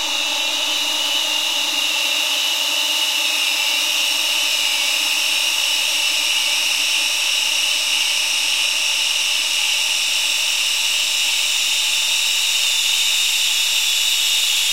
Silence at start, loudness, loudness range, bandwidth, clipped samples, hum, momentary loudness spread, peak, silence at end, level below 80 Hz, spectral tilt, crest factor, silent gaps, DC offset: 0 s; -16 LUFS; 1 LU; 16 kHz; under 0.1%; none; 2 LU; -4 dBFS; 0 s; -74 dBFS; 4 dB/octave; 14 dB; none; under 0.1%